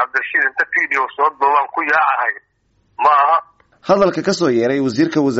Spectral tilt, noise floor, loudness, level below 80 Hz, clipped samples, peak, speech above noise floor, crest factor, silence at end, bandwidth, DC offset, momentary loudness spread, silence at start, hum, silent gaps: -3.5 dB/octave; -61 dBFS; -16 LUFS; -58 dBFS; under 0.1%; -2 dBFS; 45 dB; 14 dB; 0 s; 8 kHz; under 0.1%; 5 LU; 0 s; none; none